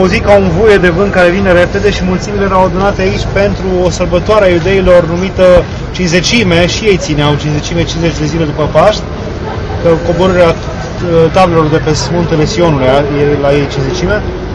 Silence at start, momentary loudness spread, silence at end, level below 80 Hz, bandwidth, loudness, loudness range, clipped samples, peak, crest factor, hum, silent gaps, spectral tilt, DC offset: 0 s; 7 LU; 0 s; -22 dBFS; 11 kHz; -9 LUFS; 3 LU; 3%; 0 dBFS; 8 dB; none; none; -5.5 dB/octave; under 0.1%